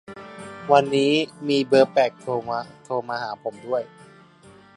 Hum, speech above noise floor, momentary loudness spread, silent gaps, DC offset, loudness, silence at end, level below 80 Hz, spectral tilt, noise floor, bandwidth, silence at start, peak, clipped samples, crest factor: none; 28 dB; 19 LU; none; under 0.1%; -22 LUFS; 0.9 s; -66 dBFS; -5.5 dB/octave; -50 dBFS; 11 kHz; 0.1 s; -2 dBFS; under 0.1%; 22 dB